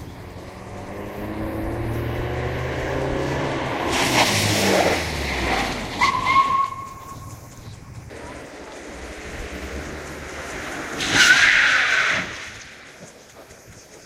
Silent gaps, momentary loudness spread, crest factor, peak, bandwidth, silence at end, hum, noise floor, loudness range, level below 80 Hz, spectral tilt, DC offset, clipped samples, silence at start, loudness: none; 22 LU; 22 dB; 0 dBFS; 16 kHz; 0 s; none; -44 dBFS; 15 LU; -40 dBFS; -3 dB/octave; under 0.1%; under 0.1%; 0 s; -20 LUFS